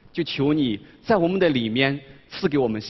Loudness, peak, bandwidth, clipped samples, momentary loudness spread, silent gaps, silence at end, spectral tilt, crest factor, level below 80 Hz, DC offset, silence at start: -22 LUFS; -4 dBFS; 6 kHz; under 0.1%; 10 LU; none; 0 s; -7.5 dB/octave; 18 dB; -54 dBFS; under 0.1%; 0.15 s